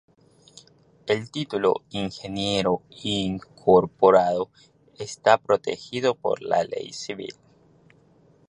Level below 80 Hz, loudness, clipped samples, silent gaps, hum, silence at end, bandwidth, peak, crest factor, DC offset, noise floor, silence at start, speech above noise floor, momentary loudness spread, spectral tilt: -58 dBFS; -24 LUFS; under 0.1%; none; none; 1.15 s; 10.5 kHz; -2 dBFS; 22 dB; under 0.1%; -58 dBFS; 1.05 s; 34 dB; 15 LU; -5 dB/octave